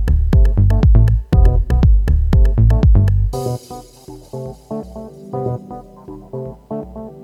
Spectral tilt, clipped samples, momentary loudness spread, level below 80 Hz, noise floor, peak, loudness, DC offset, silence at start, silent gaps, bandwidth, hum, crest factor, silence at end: -9 dB/octave; under 0.1%; 20 LU; -16 dBFS; -38 dBFS; 0 dBFS; -15 LUFS; under 0.1%; 0 s; none; 7.2 kHz; none; 14 dB; 0 s